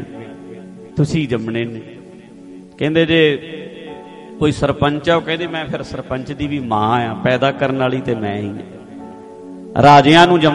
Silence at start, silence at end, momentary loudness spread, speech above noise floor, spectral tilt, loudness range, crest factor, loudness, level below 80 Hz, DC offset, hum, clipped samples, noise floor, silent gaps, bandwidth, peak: 0 s; 0 s; 25 LU; 23 dB; -6 dB/octave; 5 LU; 16 dB; -16 LUFS; -44 dBFS; under 0.1%; none; under 0.1%; -38 dBFS; none; 11 kHz; 0 dBFS